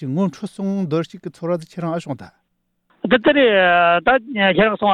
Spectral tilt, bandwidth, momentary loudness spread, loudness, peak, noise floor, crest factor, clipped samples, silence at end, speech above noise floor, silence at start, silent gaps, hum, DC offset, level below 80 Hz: -6.5 dB/octave; 10.5 kHz; 16 LU; -17 LUFS; -4 dBFS; -70 dBFS; 14 dB; under 0.1%; 0 s; 52 dB; 0 s; none; none; under 0.1%; -52 dBFS